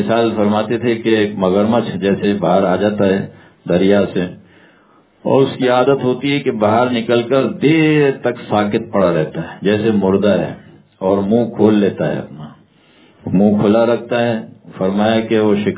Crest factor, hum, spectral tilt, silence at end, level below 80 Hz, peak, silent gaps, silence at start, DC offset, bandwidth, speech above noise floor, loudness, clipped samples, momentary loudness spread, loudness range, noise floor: 14 dB; none; -11 dB/octave; 0 s; -48 dBFS; 0 dBFS; none; 0 s; under 0.1%; 4 kHz; 36 dB; -15 LUFS; under 0.1%; 9 LU; 2 LU; -51 dBFS